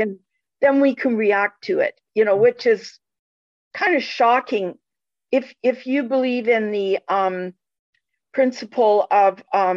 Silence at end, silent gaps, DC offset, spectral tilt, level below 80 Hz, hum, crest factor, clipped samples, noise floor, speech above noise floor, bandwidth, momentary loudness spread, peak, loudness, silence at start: 0 s; 3.19-3.71 s, 7.79-7.93 s; under 0.1%; -5.5 dB/octave; -74 dBFS; none; 14 dB; under 0.1%; -89 dBFS; 70 dB; 7.4 kHz; 9 LU; -6 dBFS; -20 LUFS; 0 s